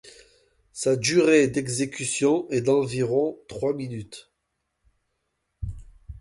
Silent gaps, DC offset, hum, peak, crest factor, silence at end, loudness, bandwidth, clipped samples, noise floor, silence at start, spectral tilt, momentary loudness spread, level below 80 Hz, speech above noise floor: none; under 0.1%; none; -8 dBFS; 18 dB; 0 s; -23 LUFS; 11.5 kHz; under 0.1%; -78 dBFS; 0.05 s; -4.5 dB/octave; 19 LU; -48 dBFS; 55 dB